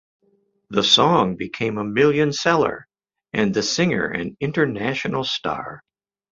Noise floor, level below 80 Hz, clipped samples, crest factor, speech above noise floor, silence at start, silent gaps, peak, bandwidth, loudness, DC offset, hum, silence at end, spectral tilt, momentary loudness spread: -64 dBFS; -56 dBFS; under 0.1%; 20 dB; 44 dB; 0.7 s; none; -2 dBFS; 7.8 kHz; -20 LUFS; under 0.1%; none; 0.55 s; -4.5 dB/octave; 11 LU